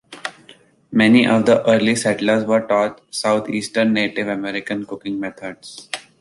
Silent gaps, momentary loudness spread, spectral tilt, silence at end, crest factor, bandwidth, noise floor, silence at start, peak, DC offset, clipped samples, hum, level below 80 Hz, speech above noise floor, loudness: none; 17 LU; -5 dB/octave; 0.2 s; 16 dB; 11.5 kHz; -49 dBFS; 0.1 s; -2 dBFS; under 0.1%; under 0.1%; none; -60 dBFS; 31 dB; -18 LUFS